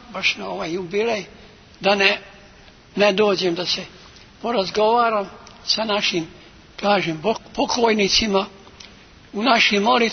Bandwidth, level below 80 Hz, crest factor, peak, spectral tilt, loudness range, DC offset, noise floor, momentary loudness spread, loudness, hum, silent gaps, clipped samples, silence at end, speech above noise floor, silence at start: 6.6 kHz; -50 dBFS; 22 dB; 0 dBFS; -3.5 dB/octave; 2 LU; under 0.1%; -47 dBFS; 16 LU; -20 LUFS; none; none; under 0.1%; 0 s; 27 dB; 0.1 s